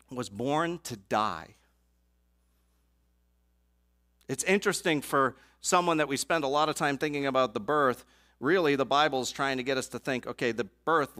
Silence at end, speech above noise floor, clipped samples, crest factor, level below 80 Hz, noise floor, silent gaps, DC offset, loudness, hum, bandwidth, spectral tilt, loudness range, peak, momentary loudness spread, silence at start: 0 s; 41 dB; under 0.1%; 20 dB; -64 dBFS; -70 dBFS; none; under 0.1%; -29 LUFS; 60 Hz at -65 dBFS; 16 kHz; -3.5 dB/octave; 9 LU; -10 dBFS; 8 LU; 0.1 s